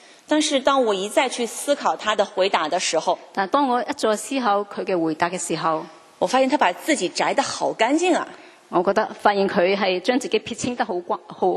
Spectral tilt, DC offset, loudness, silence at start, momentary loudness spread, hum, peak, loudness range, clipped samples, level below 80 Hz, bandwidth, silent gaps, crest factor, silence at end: -3 dB/octave; under 0.1%; -21 LUFS; 0.3 s; 6 LU; none; -2 dBFS; 1 LU; under 0.1%; -66 dBFS; 13 kHz; none; 20 dB; 0 s